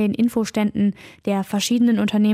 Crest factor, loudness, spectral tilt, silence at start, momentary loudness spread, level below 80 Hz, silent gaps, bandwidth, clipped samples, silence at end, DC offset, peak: 10 dB; -20 LUFS; -5.5 dB/octave; 0 s; 7 LU; -56 dBFS; none; 15 kHz; under 0.1%; 0 s; under 0.1%; -10 dBFS